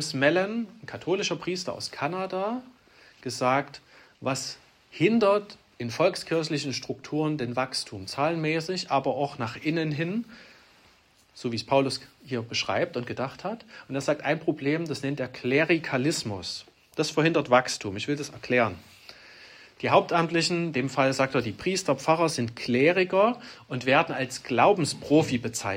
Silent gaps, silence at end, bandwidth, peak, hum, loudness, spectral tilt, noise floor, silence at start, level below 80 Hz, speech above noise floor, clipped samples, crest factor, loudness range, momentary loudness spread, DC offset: none; 0 s; 16 kHz; -6 dBFS; none; -27 LUFS; -4.5 dB/octave; -60 dBFS; 0 s; -66 dBFS; 34 dB; under 0.1%; 22 dB; 6 LU; 14 LU; under 0.1%